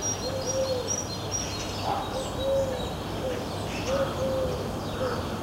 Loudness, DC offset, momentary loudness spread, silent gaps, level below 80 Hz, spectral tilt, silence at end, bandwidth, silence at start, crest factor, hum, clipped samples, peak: -29 LUFS; under 0.1%; 4 LU; none; -44 dBFS; -4 dB/octave; 0 s; 16 kHz; 0 s; 14 dB; none; under 0.1%; -16 dBFS